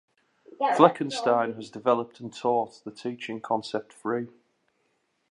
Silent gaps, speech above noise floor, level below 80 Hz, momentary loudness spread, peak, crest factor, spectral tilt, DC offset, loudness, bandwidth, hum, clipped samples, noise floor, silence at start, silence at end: none; 47 dB; -78 dBFS; 16 LU; -2 dBFS; 26 dB; -5.5 dB/octave; under 0.1%; -27 LUFS; 11 kHz; none; under 0.1%; -73 dBFS; 0.6 s; 1 s